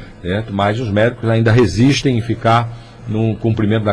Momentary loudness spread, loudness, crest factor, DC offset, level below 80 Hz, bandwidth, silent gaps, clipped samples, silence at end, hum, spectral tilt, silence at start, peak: 9 LU; -15 LUFS; 10 dB; under 0.1%; -38 dBFS; 10.5 kHz; none; under 0.1%; 0 s; none; -6.5 dB/octave; 0 s; -4 dBFS